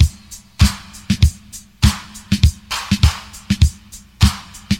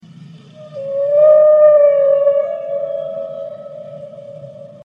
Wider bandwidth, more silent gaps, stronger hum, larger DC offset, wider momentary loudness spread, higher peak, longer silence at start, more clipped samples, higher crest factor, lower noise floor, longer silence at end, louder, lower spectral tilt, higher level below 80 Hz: first, 16.5 kHz vs 3.7 kHz; neither; neither; first, 0.1% vs under 0.1%; second, 18 LU vs 25 LU; about the same, 0 dBFS vs -2 dBFS; second, 0 s vs 0.2 s; neither; about the same, 16 dB vs 14 dB; about the same, -40 dBFS vs -38 dBFS; second, 0 s vs 0.2 s; second, -18 LUFS vs -12 LUFS; second, -4.5 dB/octave vs -7.5 dB/octave; first, -22 dBFS vs -72 dBFS